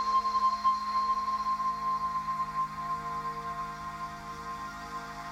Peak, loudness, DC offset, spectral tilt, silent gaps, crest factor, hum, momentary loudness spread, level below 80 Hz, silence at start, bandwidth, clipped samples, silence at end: -18 dBFS; -32 LUFS; under 0.1%; -3.5 dB/octave; none; 14 dB; none; 12 LU; -56 dBFS; 0 s; 15 kHz; under 0.1%; 0 s